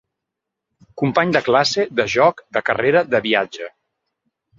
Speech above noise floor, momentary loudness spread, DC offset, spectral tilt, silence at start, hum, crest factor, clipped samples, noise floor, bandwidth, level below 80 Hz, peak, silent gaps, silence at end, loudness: 64 dB; 8 LU; under 0.1%; -4.5 dB/octave; 0.95 s; none; 20 dB; under 0.1%; -82 dBFS; 7.6 kHz; -58 dBFS; 0 dBFS; none; 0.9 s; -18 LUFS